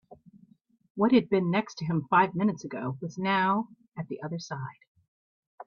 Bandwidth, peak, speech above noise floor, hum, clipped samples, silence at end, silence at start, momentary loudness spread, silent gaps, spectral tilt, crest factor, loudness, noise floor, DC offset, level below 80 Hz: 7.2 kHz; -10 dBFS; 30 dB; none; under 0.1%; 0.05 s; 0.1 s; 15 LU; 0.90-0.95 s, 4.87-4.95 s, 5.08-5.58 s; -7 dB/octave; 20 dB; -28 LUFS; -58 dBFS; under 0.1%; -70 dBFS